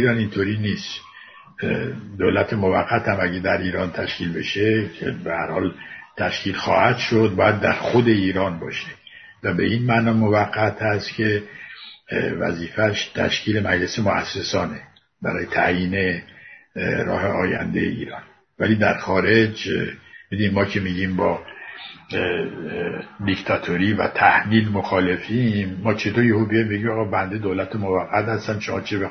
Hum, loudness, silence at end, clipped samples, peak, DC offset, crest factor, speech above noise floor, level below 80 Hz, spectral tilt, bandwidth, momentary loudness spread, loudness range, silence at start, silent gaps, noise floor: none; -21 LUFS; 0 s; under 0.1%; -2 dBFS; under 0.1%; 20 dB; 24 dB; -54 dBFS; -6.5 dB/octave; 6.6 kHz; 12 LU; 4 LU; 0 s; none; -44 dBFS